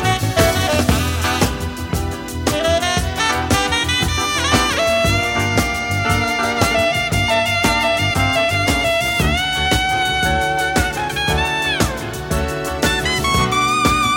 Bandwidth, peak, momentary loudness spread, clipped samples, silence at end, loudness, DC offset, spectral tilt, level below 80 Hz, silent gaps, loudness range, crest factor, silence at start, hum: 17 kHz; 0 dBFS; 5 LU; under 0.1%; 0 s; -17 LUFS; under 0.1%; -3.5 dB/octave; -30 dBFS; none; 2 LU; 16 dB; 0 s; none